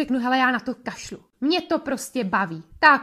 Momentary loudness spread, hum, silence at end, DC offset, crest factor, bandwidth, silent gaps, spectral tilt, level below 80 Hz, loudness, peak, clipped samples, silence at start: 14 LU; none; 0 s; under 0.1%; 20 dB; 15 kHz; none; -4 dB/octave; -58 dBFS; -23 LUFS; -2 dBFS; under 0.1%; 0 s